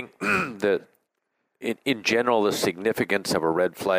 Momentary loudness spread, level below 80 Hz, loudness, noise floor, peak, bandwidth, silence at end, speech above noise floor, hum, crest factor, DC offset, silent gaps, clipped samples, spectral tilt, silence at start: 7 LU; -64 dBFS; -24 LUFS; -77 dBFS; -6 dBFS; 16 kHz; 0 s; 53 dB; none; 18 dB; under 0.1%; none; under 0.1%; -4 dB/octave; 0 s